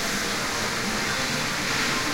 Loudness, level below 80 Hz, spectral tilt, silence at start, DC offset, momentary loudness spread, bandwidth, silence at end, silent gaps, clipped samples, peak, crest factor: -24 LUFS; -44 dBFS; -2 dB/octave; 0 s; under 0.1%; 2 LU; 16 kHz; 0 s; none; under 0.1%; -12 dBFS; 14 dB